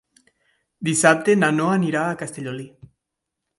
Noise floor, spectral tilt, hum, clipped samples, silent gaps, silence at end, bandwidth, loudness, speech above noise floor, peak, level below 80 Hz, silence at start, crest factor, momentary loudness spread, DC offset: -82 dBFS; -4.5 dB/octave; none; under 0.1%; none; 0.9 s; 11.5 kHz; -20 LUFS; 62 dB; 0 dBFS; -66 dBFS; 0.8 s; 22 dB; 16 LU; under 0.1%